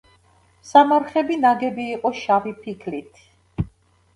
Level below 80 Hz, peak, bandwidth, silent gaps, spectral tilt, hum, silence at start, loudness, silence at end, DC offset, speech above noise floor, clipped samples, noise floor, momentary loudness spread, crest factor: -48 dBFS; 0 dBFS; 11 kHz; none; -6 dB/octave; none; 0.65 s; -20 LUFS; 0.5 s; under 0.1%; 37 dB; under 0.1%; -57 dBFS; 17 LU; 20 dB